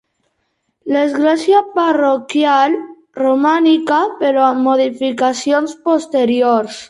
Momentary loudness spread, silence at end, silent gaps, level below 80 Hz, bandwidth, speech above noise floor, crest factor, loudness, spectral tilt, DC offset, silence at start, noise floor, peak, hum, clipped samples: 5 LU; 0.05 s; none; -66 dBFS; 11.5 kHz; 54 dB; 12 dB; -14 LUFS; -4 dB/octave; under 0.1%; 0.85 s; -68 dBFS; -2 dBFS; none; under 0.1%